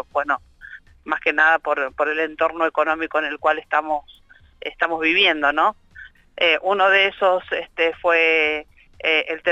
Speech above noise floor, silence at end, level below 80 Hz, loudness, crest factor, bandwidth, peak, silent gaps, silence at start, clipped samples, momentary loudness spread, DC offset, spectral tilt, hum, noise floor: 25 dB; 0 s; -56 dBFS; -19 LUFS; 16 dB; 8 kHz; -6 dBFS; none; 0.15 s; under 0.1%; 11 LU; under 0.1%; -3.5 dB/octave; none; -44 dBFS